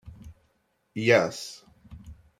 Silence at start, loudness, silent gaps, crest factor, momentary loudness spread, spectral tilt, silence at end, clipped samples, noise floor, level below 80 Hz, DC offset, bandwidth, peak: 0.05 s; -24 LUFS; none; 24 dB; 26 LU; -5 dB/octave; 0.25 s; under 0.1%; -71 dBFS; -56 dBFS; under 0.1%; 15.5 kHz; -6 dBFS